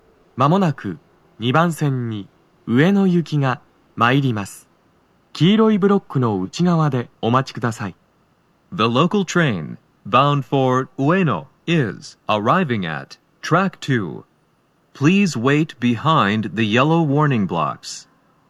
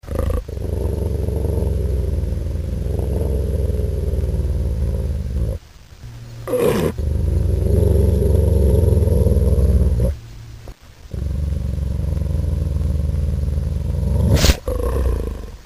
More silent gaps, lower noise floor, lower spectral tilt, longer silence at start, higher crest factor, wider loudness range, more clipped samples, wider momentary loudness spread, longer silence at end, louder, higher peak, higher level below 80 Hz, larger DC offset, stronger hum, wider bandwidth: neither; first, -60 dBFS vs -39 dBFS; about the same, -6.5 dB/octave vs -7 dB/octave; first, 0.35 s vs 0.05 s; about the same, 18 dB vs 18 dB; second, 3 LU vs 6 LU; neither; first, 15 LU vs 10 LU; first, 0.5 s vs 0.05 s; about the same, -18 LUFS vs -20 LUFS; about the same, 0 dBFS vs 0 dBFS; second, -64 dBFS vs -20 dBFS; second, under 0.1% vs 0.3%; neither; second, 13 kHz vs 16 kHz